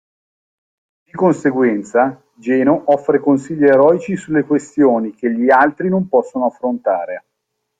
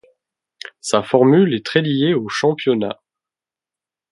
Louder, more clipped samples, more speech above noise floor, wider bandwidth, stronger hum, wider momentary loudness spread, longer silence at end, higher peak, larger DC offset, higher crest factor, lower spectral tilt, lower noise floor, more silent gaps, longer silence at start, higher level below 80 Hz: about the same, -15 LUFS vs -17 LUFS; neither; second, 59 dB vs 73 dB; second, 9.2 kHz vs 11.5 kHz; neither; second, 8 LU vs 18 LU; second, 0.6 s vs 1.2 s; about the same, 0 dBFS vs 0 dBFS; neither; about the same, 14 dB vs 18 dB; first, -8 dB/octave vs -5.5 dB/octave; second, -74 dBFS vs -89 dBFS; neither; first, 1.15 s vs 0.85 s; about the same, -60 dBFS vs -62 dBFS